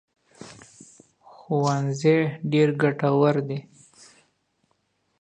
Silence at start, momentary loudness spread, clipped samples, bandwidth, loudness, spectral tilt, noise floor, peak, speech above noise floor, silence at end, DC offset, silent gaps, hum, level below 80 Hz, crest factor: 0.4 s; 18 LU; under 0.1%; 9.6 kHz; -23 LUFS; -7 dB/octave; -71 dBFS; -6 dBFS; 49 dB; 1.6 s; under 0.1%; none; none; -72 dBFS; 18 dB